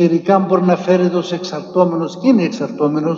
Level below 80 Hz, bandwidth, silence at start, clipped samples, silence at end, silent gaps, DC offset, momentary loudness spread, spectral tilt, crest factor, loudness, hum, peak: -64 dBFS; 7.2 kHz; 0 s; under 0.1%; 0 s; none; under 0.1%; 7 LU; -7.5 dB/octave; 14 dB; -15 LUFS; none; 0 dBFS